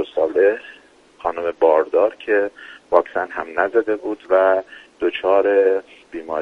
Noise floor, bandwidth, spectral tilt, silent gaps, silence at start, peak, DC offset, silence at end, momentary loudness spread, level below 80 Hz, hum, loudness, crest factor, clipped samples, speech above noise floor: -48 dBFS; 6 kHz; -5.5 dB/octave; none; 0 s; 0 dBFS; under 0.1%; 0 s; 11 LU; -60 dBFS; none; -19 LUFS; 18 dB; under 0.1%; 29 dB